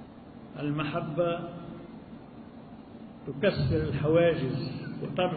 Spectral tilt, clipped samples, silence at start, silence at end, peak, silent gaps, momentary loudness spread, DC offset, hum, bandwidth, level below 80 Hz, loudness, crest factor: -11 dB/octave; under 0.1%; 0 s; 0 s; -12 dBFS; none; 22 LU; under 0.1%; none; 4.7 kHz; -52 dBFS; -29 LUFS; 18 dB